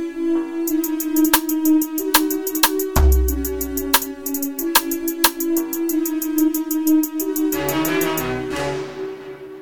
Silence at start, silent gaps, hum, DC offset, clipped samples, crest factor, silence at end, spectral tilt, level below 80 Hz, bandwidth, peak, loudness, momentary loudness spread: 0 s; none; none; 0.6%; under 0.1%; 20 dB; 0 s; -4 dB/octave; -28 dBFS; over 20 kHz; 0 dBFS; -19 LUFS; 7 LU